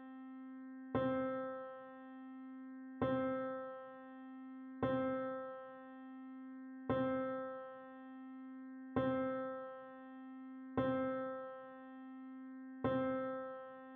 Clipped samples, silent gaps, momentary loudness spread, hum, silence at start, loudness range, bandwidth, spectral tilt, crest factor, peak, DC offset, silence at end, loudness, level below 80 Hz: under 0.1%; none; 15 LU; none; 0 s; 3 LU; 4.2 kHz; -6 dB/octave; 20 dB; -24 dBFS; under 0.1%; 0 s; -43 LUFS; -72 dBFS